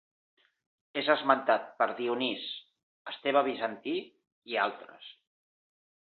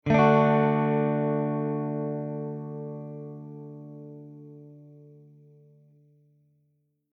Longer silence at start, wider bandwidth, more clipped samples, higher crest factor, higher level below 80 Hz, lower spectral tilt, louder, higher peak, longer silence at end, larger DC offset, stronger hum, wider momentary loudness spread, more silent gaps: first, 0.95 s vs 0.05 s; second, 4.7 kHz vs 6.2 kHz; neither; about the same, 24 dB vs 20 dB; second, -82 dBFS vs -62 dBFS; second, -7 dB/octave vs -9 dB/octave; second, -30 LUFS vs -26 LUFS; about the same, -8 dBFS vs -8 dBFS; second, 0.9 s vs 2.3 s; neither; neither; second, 20 LU vs 25 LU; first, 2.83-3.05 s, 4.32-4.42 s vs none